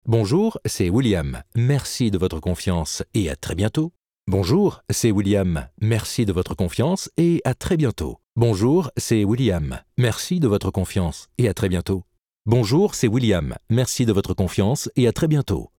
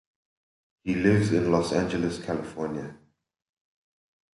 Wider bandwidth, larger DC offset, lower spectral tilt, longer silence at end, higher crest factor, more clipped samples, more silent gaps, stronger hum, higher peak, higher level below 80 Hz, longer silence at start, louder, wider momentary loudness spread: first, 17 kHz vs 11.5 kHz; neither; about the same, -6 dB/octave vs -6.5 dB/octave; second, 0.15 s vs 1.4 s; about the same, 16 dB vs 20 dB; neither; neither; neither; first, -4 dBFS vs -8 dBFS; first, -40 dBFS vs -52 dBFS; second, 0.05 s vs 0.85 s; first, -21 LUFS vs -26 LUFS; second, 6 LU vs 13 LU